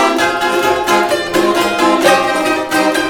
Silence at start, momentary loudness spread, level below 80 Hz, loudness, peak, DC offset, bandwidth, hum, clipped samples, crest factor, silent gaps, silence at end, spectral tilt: 0 s; 3 LU; -48 dBFS; -13 LUFS; 0 dBFS; under 0.1%; 19 kHz; none; under 0.1%; 12 dB; none; 0 s; -3 dB/octave